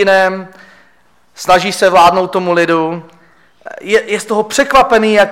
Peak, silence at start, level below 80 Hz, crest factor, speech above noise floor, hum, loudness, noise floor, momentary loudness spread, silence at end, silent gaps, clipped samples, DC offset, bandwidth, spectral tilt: 0 dBFS; 0 s; -44 dBFS; 12 dB; 42 dB; none; -11 LUFS; -53 dBFS; 15 LU; 0 s; none; under 0.1%; under 0.1%; 16.5 kHz; -4 dB/octave